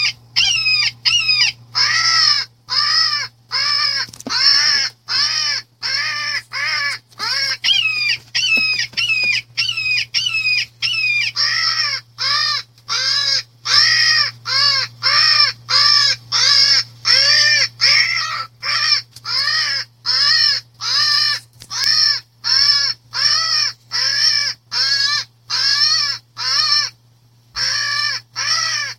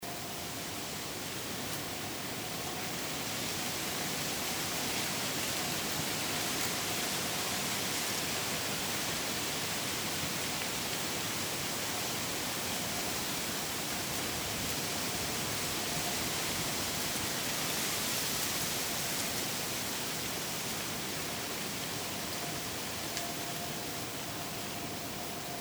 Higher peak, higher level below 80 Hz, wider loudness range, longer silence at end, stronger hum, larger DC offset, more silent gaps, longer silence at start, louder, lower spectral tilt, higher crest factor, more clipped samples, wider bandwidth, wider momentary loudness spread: first, 0 dBFS vs -16 dBFS; about the same, -58 dBFS vs -60 dBFS; about the same, 5 LU vs 4 LU; about the same, 0.05 s vs 0 s; neither; neither; neither; about the same, 0 s vs 0 s; first, -14 LUFS vs -33 LUFS; second, 1.5 dB/octave vs -2 dB/octave; about the same, 18 dB vs 20 dB; neither; second, 16.5 kHz vs over 20 kHz; first, 9 LU vs 5 LU